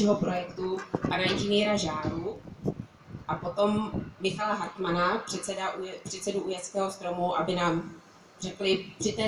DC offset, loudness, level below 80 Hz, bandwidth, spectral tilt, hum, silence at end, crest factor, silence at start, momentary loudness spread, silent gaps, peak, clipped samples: under 0.1%; -30 LUFS; -56 dBFS; 12.5 kHz; -4.5 dB/octave; none; 0 s; 18 dB; 0 s; 10 LU; none; -12 dBFS; under 0.1%